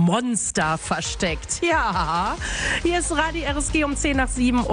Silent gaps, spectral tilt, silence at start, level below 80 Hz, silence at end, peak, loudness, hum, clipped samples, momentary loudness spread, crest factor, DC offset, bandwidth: none; -4 dB/octave; 0 s; -32 dBFS; 0 s; -8 dBFS; -22 LUFS; none; under 0.1%; 4 LU; 14 dB; under 0.1%; 10.5 kHz